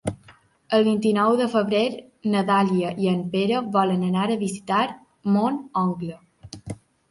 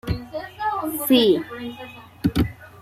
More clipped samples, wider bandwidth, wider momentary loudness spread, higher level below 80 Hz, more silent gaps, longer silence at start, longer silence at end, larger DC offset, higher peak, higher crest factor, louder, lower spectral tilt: neither; second, 11.5 kHz vs 16 kHz; about the same, 15 LU vs 17 LU; second, -58 dBFS vs -40 dBFS; neither; about the same, 0.05 s vs 0.05 s; first, 0.35 s vs 0 s; neither; about the same, -6 dBFS vs -6 dBFS; about the same, 16 dB vs 18 dB; about the same, -23 LUFS vs -22 LUFS; about the same, -6.5 dB/octave vs -5.5 dB/octave